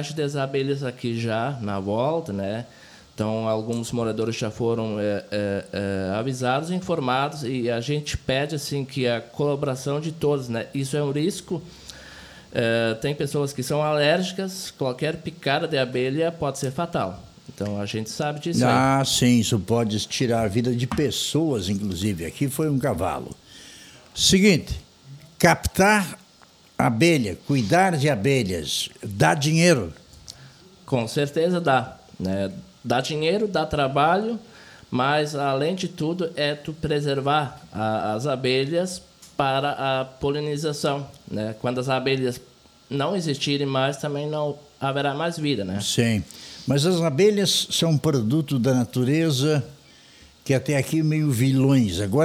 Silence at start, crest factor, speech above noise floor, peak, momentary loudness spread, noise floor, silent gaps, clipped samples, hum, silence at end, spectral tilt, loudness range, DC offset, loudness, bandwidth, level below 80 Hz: 0 s; 18 dB; 30 dB; -4 dBFS; 12 LU; -53 dBFS; none; under 0.1%; none; 0 s; -5 dB/octave; 5 LU; under 0.1%; -23 LUFS; 18.5 kHz; -50 dBFS